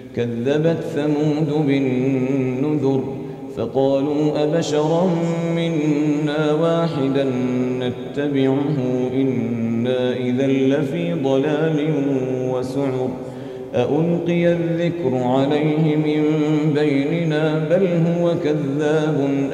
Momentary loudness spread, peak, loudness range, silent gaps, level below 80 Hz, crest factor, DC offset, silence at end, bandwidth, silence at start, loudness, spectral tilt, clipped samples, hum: 4 LU; -6 dBFS; 2 LU; none; -58 dBFS; 14 dB; under 0.1%; 0 s; 9.8 kHz; 0 s; -19 LUFS; -7.5 dB/octave; under 0.1%; none